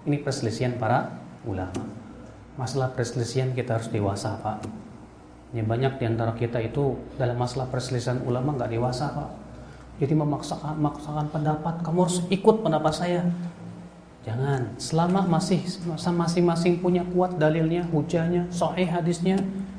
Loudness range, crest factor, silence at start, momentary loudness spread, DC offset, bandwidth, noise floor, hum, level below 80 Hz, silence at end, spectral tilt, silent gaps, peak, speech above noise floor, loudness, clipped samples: 5 LU; 20 dB; 0 s; 15 LU; under 0.1%; 10.5 kHz; -47 dBFS; none; -50 dBFS; 0 s; -6.5 dB/octave; none; -4 dBFS; 22 dB; -26 LUFS; under 0.1%